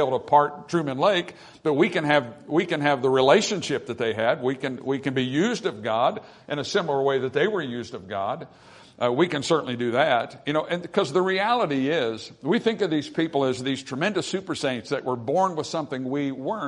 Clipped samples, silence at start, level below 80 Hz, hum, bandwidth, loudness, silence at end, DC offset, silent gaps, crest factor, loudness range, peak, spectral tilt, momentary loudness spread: under 0.1%; 0 s; -68 dBFS; none; 11 kHz; -24 LUFS; 0 s; under 0.1%; none; 22 dB; 4 LU; -2 dBFS; -5 dB/octave; 9 LU